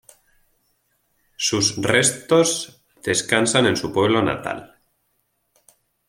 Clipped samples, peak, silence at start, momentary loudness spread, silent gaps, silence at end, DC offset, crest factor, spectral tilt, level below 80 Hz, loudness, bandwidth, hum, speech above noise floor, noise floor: under 0.1%; -2 dBFS; 1.4 s; 12 LU; none; 1.45 s; under 0.1%; 22 dB; -3 dB/octave; -56 dBFS; -19 LUFS; 16.5 kHz; none; 50 dB; -70 dBFS